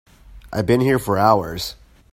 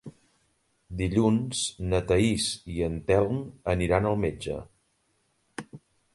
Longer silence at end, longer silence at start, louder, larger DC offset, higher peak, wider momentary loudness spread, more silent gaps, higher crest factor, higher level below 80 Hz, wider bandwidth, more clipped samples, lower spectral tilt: about the same, 0.4 s vs 0.4 s; first, 0.3 s vs 0.05 s; first, -19 LUFS vs -27 LUFS; neither; first, 0 dBFS vs -10 dBFS; second, 13 LU vs 18 LU; neither; about the same, 20 dB vs 20 dB; about the same, -44 dBFS vs -44 dBFS; first, 16.5 kHz vs 11.5 kHz; neither; about the same, -6 dB/octave vs -5.5 dB/octave